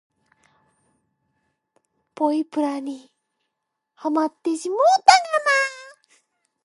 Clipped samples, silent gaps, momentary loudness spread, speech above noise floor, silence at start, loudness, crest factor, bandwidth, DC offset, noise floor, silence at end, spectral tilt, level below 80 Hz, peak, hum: under 0.1%; none; 16 LU; 61 dB; 2.2 s; -20 LUFS; 24 dB; 11.5 kHz; under 0.1%; -80 dBFS; 0.75 s; -1 dB/octave; -66 dBFS; 0 dBFS; none